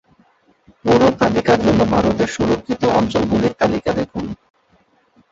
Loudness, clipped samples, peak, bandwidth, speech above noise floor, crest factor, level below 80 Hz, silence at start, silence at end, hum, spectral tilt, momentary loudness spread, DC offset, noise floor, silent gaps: -17 LUFS; under 0.1%; -2 dBFS; 7.8 kHz; 41 dB; 16 dB; -40 dBFS; 0.85 s; 0.95 s; none; -6.5 dB/octave; 11 LU; under 0.1%; -57 dBFS; none